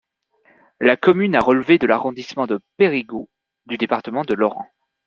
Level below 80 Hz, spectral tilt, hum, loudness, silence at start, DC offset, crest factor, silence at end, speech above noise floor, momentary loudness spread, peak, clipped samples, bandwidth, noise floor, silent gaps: -58 dBFS; -7 dB/octave; none; -18 LUFS; 0.8 s; under 0.1%; 18 dB; 0.4 s; 41 dB; 16 LU; -2 dBFS; under 0.1%; 7.2 kHz; -60 dBFS; none